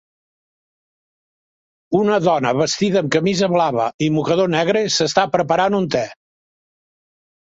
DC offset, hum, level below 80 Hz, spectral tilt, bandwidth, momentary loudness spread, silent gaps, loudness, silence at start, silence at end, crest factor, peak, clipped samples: under 0.1%; none; -58 dBFS; -5 dB/octave; 8 kHz; 3 LU; 3.94-3.99 s; -17 LUFS; 1.9 s; 1.45 s; 18 dB; -2 dBFS; under 0.1%